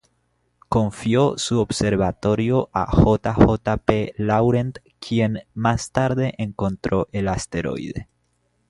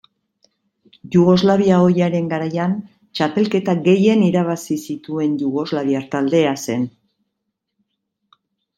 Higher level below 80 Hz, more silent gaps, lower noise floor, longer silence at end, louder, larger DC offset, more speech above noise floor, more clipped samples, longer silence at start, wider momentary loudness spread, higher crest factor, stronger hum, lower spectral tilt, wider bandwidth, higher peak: first, -36 dBFS vs -60 dBFS; neither; second, -68 dBFS vs -77 dBFS; second, 0.65 s vs 1.9 s; second, -21 LUFS vs -18 LUFS; neither; second, 48 dB vs 60 dB; neither; second, 0.7 s vs 1.05 s; about the same, 9 LU vs 10 LU; about the same, 20 dB vs 16 dB; neither; about the same, -6.5 dB/octave vs -7 dB/octave; second, 11.5 kHz vs 13.5 kHz; about the same, 0 dBFS vs -2 dBFS